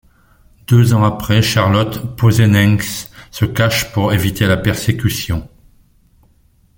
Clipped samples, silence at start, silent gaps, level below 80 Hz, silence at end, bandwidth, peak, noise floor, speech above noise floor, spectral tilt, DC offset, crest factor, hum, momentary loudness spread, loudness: under 0.1%; 0.7 s; none; -38 dBFS; 1.3 s; 17 kHz; 0 dBFS; -53 dBFS; 39 dB; -5.5 dB/octave; under 0.1%; 14 dB; none; 11 LU; -14 LUFS